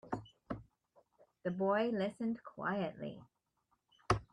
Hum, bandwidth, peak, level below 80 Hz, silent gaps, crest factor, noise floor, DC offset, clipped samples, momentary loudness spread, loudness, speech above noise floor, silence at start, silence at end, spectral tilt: none; 11 kHz; -14 dBFS; -62 dBFS; none; 24 dB; -81 dBFS; under 0.1%; under 0.1%; 14 LU; -39 LUFS; 44 dB; 0.05 s; 0.1 s; -6.5 dB/octave